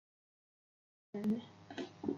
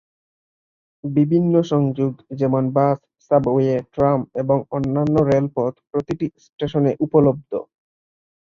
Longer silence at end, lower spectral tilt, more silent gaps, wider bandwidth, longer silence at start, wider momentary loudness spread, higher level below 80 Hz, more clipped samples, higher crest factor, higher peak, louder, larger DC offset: second, 0 s vs 0.85 s; second, -7 dB/octave vs -9.5 dB/octave; second, none vs 6.53-6.58 s; about the same, 7.4 kHz vs 7 kHz; about the same, 1.15 s vs 1.05 s; about the same, 11 LU vs 10 LU; second, -82 dBFS vs -52 dBFS; neither; about the same, 20 dB vs 18 dB; second, -24 dBFS vs -2 dBFS; second, -42 LUFS vs -20 LUFS; neither